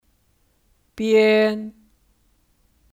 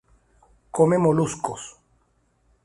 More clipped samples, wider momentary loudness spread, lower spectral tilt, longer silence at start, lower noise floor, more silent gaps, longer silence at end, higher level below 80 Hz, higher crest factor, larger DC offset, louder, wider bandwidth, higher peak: neither; about the same, 17 LU vs 18 LU; about the same, -5.5 dB/octave vs -6.5 dB/octave; first, 0.95 s vs 0.75 s; about the same, -64 dBFS vs -66 dBFS; neither; first, 1.25 s vs 0.95 s; about the same, -60 dBFS vs -56 dBFS; about the same, 16 dB vs 20 dB; neither; first, -19 LUFS vs -22 LUFS; first, 15 kHz vs 11.5 kHz; about the same, -6 dBFS vs -6 dBFS